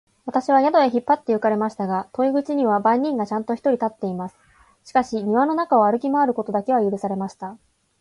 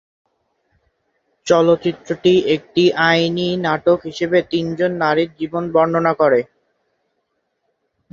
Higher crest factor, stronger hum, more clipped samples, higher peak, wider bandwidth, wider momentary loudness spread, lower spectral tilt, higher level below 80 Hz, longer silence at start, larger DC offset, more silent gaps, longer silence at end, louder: about the same, 16 dB vs 16 dB; neither; neither; second, -6 dBFS vs -2 dBFS; first, 11.5 kHz vs 7.6 kHz; first, 10 LU vs 7 LU; about the same, -7 dB/octave vs -6 dB/octave; second, -64 dBFS vs -58 dBFS; second, 0.25 s vs 1.45 s; neither; neither; second, 0.45 s vs 1.7 s; second, -21 LUFS vs -17 LUFS